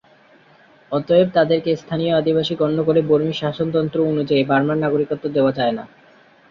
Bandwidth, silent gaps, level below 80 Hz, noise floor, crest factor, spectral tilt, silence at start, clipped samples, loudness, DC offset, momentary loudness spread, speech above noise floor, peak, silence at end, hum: 7.2 kHz; none; -58 dBFS; -51 dBFS; 16 dB; -8 dB/octave; 0.9 s; under 0.1%; -19 LUFS; under 0.1%; 6 LU; 33 dB; -2 dBFS; 0.65 s; none